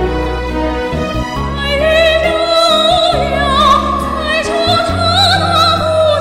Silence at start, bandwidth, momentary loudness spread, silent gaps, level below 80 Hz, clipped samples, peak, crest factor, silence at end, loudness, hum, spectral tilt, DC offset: 0 s; 16 kHz; 8 LU; none; -26 dBFS; under 0.1%; 0 dBFS; 12 dB; 0 s; -12 LUFS; none; -4.5 dB/octave; under 0.1%